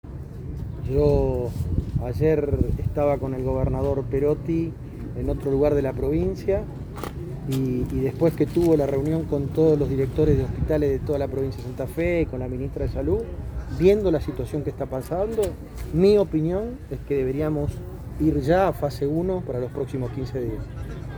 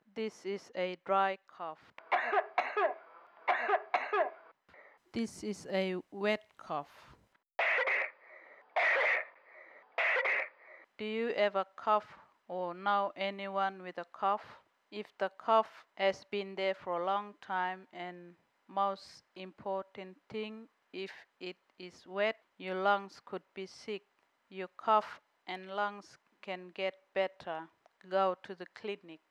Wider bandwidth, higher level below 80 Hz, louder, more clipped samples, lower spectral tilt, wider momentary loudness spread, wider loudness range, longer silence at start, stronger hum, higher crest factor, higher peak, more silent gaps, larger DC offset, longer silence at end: first, over 20 kHz vs 11.5 kHz; first, -34 dBFS vs -82 dBFS; first, -24 LUFS vs -35 LUFS; neither; first, -8.5 dB/octave vs -4.5 dB/octave; second, 13 LU vs 18 LU; second, 3 LU vs 7 LU; about the same, 0.05 s vs 0.15 s; neither; about the same, 18 dB vs 20 dB; first, -6 dBFS vs -16 dBFS; neither; neither; second, 0 s vs 0.15 s